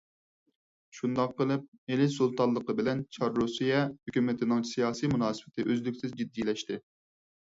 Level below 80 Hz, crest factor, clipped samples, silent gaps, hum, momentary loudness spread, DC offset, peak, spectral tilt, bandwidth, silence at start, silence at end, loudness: -66 dBFS; 18 dB; under 0.1%; 1.68-1.72 s, 1.78-1.87 s; none; 8 LU; under 0.1%; -14 dBFS; -6 dB/octave; 7.8 kHz; 0.95 s; 0.7 s; -31 LUFS